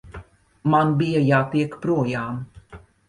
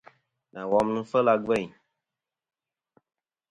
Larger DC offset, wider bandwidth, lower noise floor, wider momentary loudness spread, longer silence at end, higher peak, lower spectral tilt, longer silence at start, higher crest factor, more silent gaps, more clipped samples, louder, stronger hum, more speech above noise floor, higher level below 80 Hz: neither; about the same, 10.5 kHz vs 11 kHz; second, -46 dBFS vs -89 dBFS; about the same, 15 LU vs 17 LU; second, 0.3 s vs 1.85 s; about the same, -6 dBFS vs -8 dBFS; first, -8 dB/octave vs -6.5 dB/octave; second, 0.05 s vs 0.55 s; about the same, 16 dB vs 20 dB; neither; neither; first, -21 LUFS vs -25 LUFS; neither; second, 25 dB vs 64 dB; first, -52 dBFS vs -64 dBFS